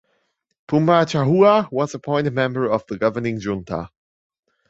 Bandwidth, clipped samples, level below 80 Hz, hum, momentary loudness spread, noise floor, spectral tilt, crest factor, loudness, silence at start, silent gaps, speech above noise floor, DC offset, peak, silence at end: 8 kHz; under 0.1%; -54 dBFS; none; 12 LU; -69 dBFS; -7 dB/octave; 20 dB; -19 LUFS; 0.7 s; none; 51 dB; under 0.1%; 0 dBFS; 0.8 s